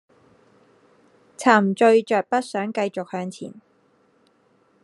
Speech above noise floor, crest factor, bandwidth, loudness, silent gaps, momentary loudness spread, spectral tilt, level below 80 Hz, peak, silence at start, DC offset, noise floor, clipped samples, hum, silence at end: 41 dB; 22 dB; 11.5 kHz; -21 LUFS; none; 16 LU; -5.5 dB/octave; -78 dBFS; 0 dBFS; 1.4 s; under 0.1%; -61 dBFS; under 0.1%; none; 1.25 s